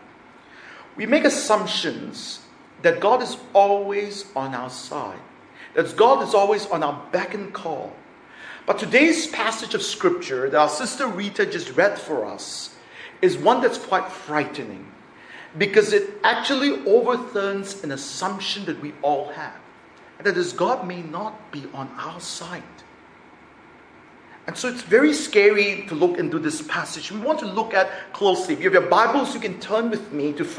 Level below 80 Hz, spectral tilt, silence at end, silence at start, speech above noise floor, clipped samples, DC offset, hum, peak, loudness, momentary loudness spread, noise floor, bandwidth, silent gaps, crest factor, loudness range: -68 dBFS; -3.5 dB/octave; 0 s; 0.55 s; 27 dB; under 0.1%; under 0.1%; none; -2 dBFS; -22 LUFS; 17 LU; -48 dBFS; 10.5 kHz; none; 20 dB; 7 LU